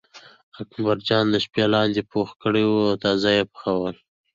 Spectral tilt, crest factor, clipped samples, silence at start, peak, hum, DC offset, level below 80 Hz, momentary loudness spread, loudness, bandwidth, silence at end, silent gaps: -6 dB/octave; 18 dB; under 0.1%; 0.15 s; -6 dBFS; none; under 0.1%; -56 dBFS; 8 LU; -22 LUFS; 7.6 kHz; 0.4 s; 0.43-0.52 s